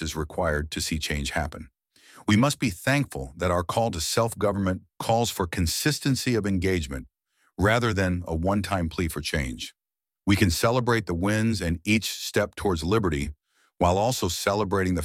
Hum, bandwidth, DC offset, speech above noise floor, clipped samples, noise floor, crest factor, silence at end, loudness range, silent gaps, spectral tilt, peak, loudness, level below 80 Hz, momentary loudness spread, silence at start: none; 17 kHz; under 0.1%; over 65 dB; under 0.1%; under -90 dBFS; 18 dB; 0 s; 2 LU; none; -5 dB/octave; -8 dBFS; -25 LUFS; -42 dBFS; 8 LU; 0 s